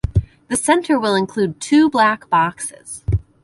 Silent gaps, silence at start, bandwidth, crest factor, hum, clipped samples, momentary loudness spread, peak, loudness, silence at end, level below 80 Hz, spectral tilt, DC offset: none; 0.05 s; 11.5 kHz; 16 dB; none; under 0.1%; 9 LU; 0 dBFS; -17 LUFS; 0.2 s; -32 dBFS; -5 dB/octave; under 0.1%